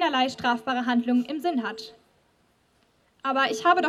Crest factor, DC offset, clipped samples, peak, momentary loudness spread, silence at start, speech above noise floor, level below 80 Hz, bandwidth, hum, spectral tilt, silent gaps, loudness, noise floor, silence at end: 20 dB; under 0.1%; under 0.1%; -6 dBFS; 11 LU; 0 s; 41 dB; -70 dBFS; 13.5 kHz; none; -3.5 dB/octave; none; -25 LUFS; -66 dBFS; 0 s